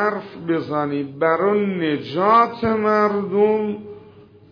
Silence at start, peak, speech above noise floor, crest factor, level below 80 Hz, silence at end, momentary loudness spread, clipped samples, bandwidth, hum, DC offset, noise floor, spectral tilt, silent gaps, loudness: 0 s; -4 dBFS; 27 dB; 16 dB; -58 dBFS; 0.45 s; 10 LU; under 0.1%; 5.4 kHz; none; under 0.1%; -46 dBFS; -8.5 dB/octave; none; -19 LUFS